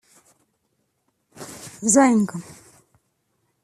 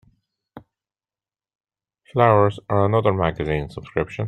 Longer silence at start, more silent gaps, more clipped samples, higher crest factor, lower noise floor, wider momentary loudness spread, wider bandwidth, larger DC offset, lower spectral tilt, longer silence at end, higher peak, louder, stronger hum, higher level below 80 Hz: first, 1.4 s vs 0.55 s; neither; neither; about the same, 22 dB vs 20 dB; second, -72 dBFS vs under -90 dBFS; first, 23 LU vs 11 LU; first, 14 kHz vs 9 kHz; neither; second, -4.5 dB/octave vs -8.5 dB/octave; first, 1.25 s vs 0 s; about the same, -2 dBFS vs -2 dBFS; about the same, -18 LUFS vs -20 LUFS; neither; second, -66 dBFS vs -46 dBFS